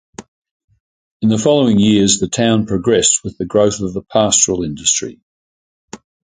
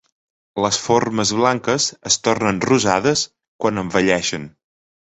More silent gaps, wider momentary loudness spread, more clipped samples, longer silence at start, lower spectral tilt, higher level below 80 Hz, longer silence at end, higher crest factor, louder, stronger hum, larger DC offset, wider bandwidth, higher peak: first, 0.28-0.42 s, 0.51-0.68 s, 0.80-1.20 s, 5.23-5.88 s vs 3.48-3.59 s; about the same, 7 LU vs 8 LU; neither; second, 0.2 s vs 0.55 s; about the same, -4 dB/octave vs -3.5 dB/octave; first, -44 dBFS vs -52 dBFS; second, 0.35 s vs 0.55 s; about the same, 16 dB vs 18 dB; first, -14 LUFS vs -18 LUFS; neither; neither; first, 9.6 kHz vs 8.4 kHz; about the same, 0 dBFS vs -2 dBFS